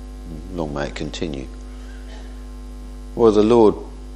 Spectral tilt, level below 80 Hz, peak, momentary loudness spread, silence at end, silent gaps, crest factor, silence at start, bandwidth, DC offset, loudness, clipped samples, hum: -7 dB/octave; -34 dBFS; -2 dBFS; 23 LU; 0 s; none; 20 dB; 0 s; 11.5 kHz; under 0.1%; -18 LUFS; under 0.1%; 50 Hz at -35 dBFS